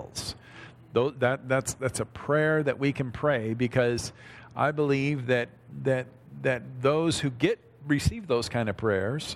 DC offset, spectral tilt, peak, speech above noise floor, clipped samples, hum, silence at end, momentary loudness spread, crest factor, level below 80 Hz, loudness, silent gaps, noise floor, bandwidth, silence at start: under 0.1%; -5.5 dB/octave; -10 dBFS; 21 dB; under 0.1%; none; 0 s; 11 LU; 18 dB; -50 dBFS; -28 LUFS; none; -48 dBFS; 14.5 kHz; 0 s